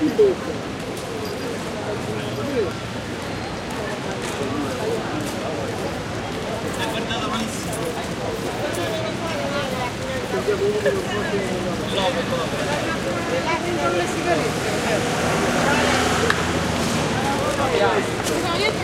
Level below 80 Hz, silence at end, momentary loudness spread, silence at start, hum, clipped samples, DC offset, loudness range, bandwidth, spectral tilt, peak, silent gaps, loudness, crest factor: -42 dBFS; 0 s; 8 LU; 0 s; none; under 0.1%; under 0.1%; 6 LU; 16 kHz; -4.5 dB/octave; -2 dBFS; none; -23 LUFS; 20 dB